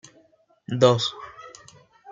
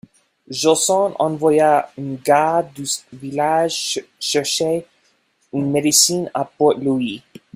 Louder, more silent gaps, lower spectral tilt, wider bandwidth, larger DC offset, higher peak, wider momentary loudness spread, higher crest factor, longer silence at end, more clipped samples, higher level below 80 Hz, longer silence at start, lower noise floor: second, -22 LUFS vs -18 LUFS; neither; first, -5.5 dB/octave vs -3 dB/octave; second, 8.8 kHz vs 16 kHz; neither; about the same, -2 dBFS vs 0 dBFS; first, 24 LU vs 11 LU; first, 24 dB vs 18 dB; second, 0 s vs 0.35 s; neither; about the same, -66 dBFS vs -62 dBFS; first, 0.7 s vs 0.5 s; about the same, -61 dBFS vs -62 dBFS